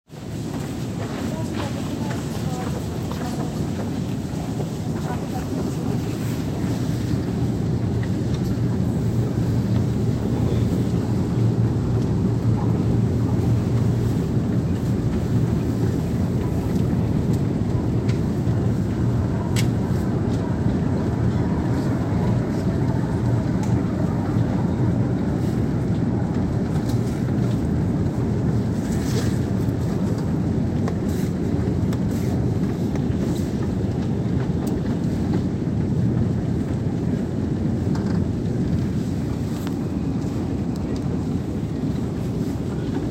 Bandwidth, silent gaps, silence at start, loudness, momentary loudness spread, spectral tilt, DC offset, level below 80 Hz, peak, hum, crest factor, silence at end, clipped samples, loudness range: 16 kHz; none; 0.1 s; -23 LUFS; 5 LU; -8 dB/octave; under 0.1%; -36 dBFS; -6 dBFS; none; 14 dB; 0 s; under 0.1%; 4 LU